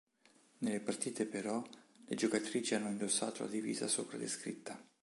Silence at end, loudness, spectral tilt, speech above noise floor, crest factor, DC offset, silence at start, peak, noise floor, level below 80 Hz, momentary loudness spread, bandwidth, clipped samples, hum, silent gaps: 0.2 s; -38 LUFS; -3 dB/octave; 31 dB; 18 dB; under 0.1%; 0.6 s; -20 dBFS; -69 dBFS; -84 dBFS; 10 LU; 11.5 kHz; under 0.1%; none; none